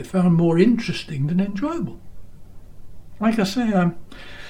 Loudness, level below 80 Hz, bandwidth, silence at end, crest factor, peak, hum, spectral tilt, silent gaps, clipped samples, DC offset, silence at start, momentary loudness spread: -21 LUFS; -44 dBFS; 14.5 kHz; 0 s; 18 dB; -4 dBFS; none; -7 dB/octave; none; under 0.1%; under 0.1%; 0 s; 12 LU